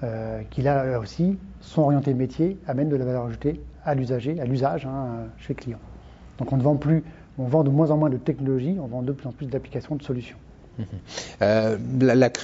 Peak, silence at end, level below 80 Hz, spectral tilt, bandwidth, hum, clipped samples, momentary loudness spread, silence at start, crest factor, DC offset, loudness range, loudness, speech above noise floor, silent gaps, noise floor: -6 dBFS; 0 s; -48 dBFS; -7.5 dB/octave; 7.8 kHz; none; under 0.1%; 14 LU; 0 s; 18 dB; under 0.1%; 5 LU; -24 LUFS; 20 dB; none; -44 dBFS